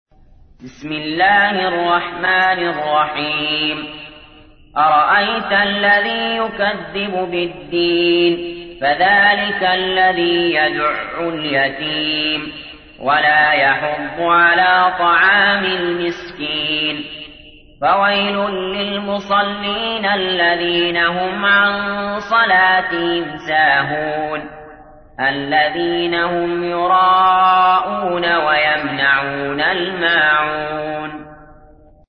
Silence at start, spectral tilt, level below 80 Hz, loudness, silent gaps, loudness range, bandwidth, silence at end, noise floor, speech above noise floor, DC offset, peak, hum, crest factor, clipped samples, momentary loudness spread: 0.6 s; -6 dB/octave; -48 dBFS; -15 LUFS; none; 4 LU; 6.4 kHz; 0.55 s; -46 dBFS; 30 dB; under 0.1%; -2 dBFS; none; 14 dB; under 0.1%; 11 LU